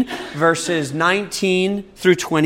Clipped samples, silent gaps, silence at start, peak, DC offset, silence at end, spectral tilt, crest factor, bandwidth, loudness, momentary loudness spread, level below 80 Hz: under 0.1%; none; 0 s; -2 dBFS; under 0.1%; 0 s; -4.5 dB/octave; 16 dB; 16.5 kHz; -18 LUFS; 4 LU; -54 dBFS